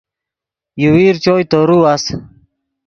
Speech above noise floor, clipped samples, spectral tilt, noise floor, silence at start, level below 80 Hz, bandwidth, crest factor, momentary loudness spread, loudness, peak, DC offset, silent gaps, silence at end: 74 dB; under 0.1%; -6 dB/octave; -85 dBFS; 0.75 s; -46 dBFS; 7.4 kHz; 14 dB; 14 LU; -12 LUFS; 0 dBFS; under 0.1%; none; 0.6 s